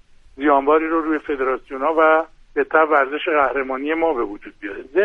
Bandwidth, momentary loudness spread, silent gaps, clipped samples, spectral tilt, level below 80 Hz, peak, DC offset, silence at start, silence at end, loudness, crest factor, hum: 4.9 kHz; 11 LU; none; under 0.1%; -6 dB/octave; -50 dBFS; -4 dBFS; under 0.1%; 0.4 s; 0 s; -19 LUFS; 16 dB; none